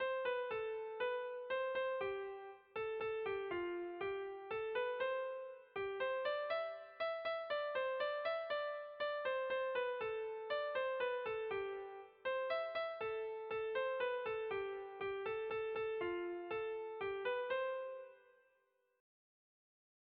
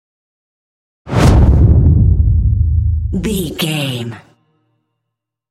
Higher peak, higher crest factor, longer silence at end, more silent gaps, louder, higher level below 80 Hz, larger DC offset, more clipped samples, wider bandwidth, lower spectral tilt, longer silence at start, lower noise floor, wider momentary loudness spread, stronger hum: second, -28 dBFS vs 0 dBFS; about the same, 14 dB vs 12 dB; first, 1.8 s vs 1.35 s; neither; second, -42 LUFS vs -13 LUFS; second, -78 dBFS vs -18 dBFS; neither; neither; second, 5 kHz vs 14 kHz; second, -1 dB/octave vs -6.5 dB/octave; second, 0 s vs 1.05 s; about the same, -79 dBFS vs -77 dBFS; second, 6 LU vs 10 LU; neither